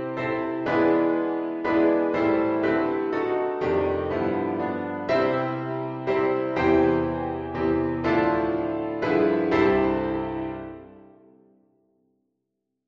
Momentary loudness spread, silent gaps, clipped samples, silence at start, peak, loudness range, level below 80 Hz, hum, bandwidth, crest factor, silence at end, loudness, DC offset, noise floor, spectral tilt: 8 LU; none; under 0.1%; 0 s; -8 dBFS; 2 LU; -50 dBFS; none; 6.2 kHz; 16 dB; 1.9 s; -24 LUFS; under 0.1%; -80 dBFS; -8.5 dB/octave